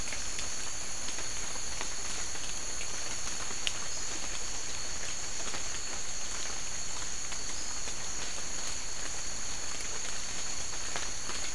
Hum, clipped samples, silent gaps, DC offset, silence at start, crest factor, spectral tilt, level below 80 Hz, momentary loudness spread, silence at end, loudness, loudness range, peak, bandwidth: none; under 0.1%; none; 3%; 0 s; 28 dB; -0.5 dB/octave; -50 dBFS; 1 LU; 0 s; -35 LUFS; 1 LU; -10 dBFS; 12 kHz